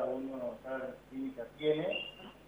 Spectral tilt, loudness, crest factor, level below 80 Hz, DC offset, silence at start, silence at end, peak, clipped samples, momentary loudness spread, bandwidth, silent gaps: -6.5 dB/octave; -38 LUFS; 18 dB; -66 dBFS; under 0.1%; 0 s; 0 s; -20 dBFS; under 0.1%; 9 LU; 19.5 kHz; none